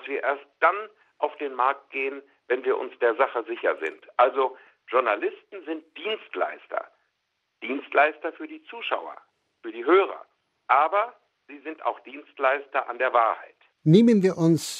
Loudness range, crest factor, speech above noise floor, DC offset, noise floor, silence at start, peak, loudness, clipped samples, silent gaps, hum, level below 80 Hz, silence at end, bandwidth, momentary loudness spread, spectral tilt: 5 LU; 20 dB; 52 dB; under 0.1%; -77 dBFS; 0 s; -4 dBFS; -25 LUFS; under 0.1%; none; none; -84 dBFS; 0 s; 13 kHz; 17 LU; -6 dB/octave